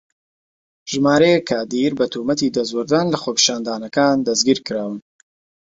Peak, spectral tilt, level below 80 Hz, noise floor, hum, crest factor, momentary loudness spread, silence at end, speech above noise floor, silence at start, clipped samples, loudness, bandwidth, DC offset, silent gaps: 0 dBFS; -3.5 dB/octave; -58 dBFS; under -90 dBFS; none; 18 dB; 11 LU; 0.6 s; over 72 dB; 0.85 s; under 0.1%; -18 LUFS; 7.8 kHz; under 0.1%; none